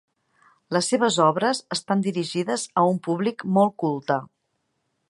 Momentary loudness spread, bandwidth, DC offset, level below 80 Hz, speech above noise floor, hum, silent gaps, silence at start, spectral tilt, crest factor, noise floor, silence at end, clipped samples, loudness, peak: 7 LU; 11.5 kHz; under 0.1%; -74 dBFS; 52 dB; none; none; 0.7 s; -5 dB/octave; 18 dB; -75 dBFS; 0.85 s; under 0.1%; -23 LUFS; -6 dBFS